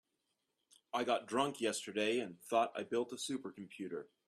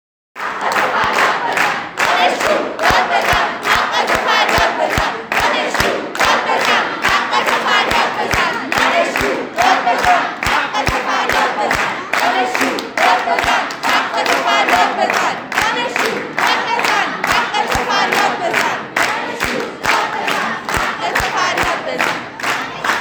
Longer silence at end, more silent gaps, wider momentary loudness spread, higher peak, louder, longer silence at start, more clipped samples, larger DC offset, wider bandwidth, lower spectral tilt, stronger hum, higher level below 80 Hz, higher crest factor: first, 0.2 s vs 0 s; neither; first, 10 LU vs 5 LU; second, -18 dBFS vs 0 dBFS; second, -38 LUFS vs -15 LUFS; first, 0.95 s vs 0.35 s; neither; neither; second, 14 kHz vs over 20 kHz; about the same, -3.5 dB/octave vs -2.5 dB/octave; neither; second, -84 dBFS vs -40 dBFS; about the same, 20 dB vs 16 dB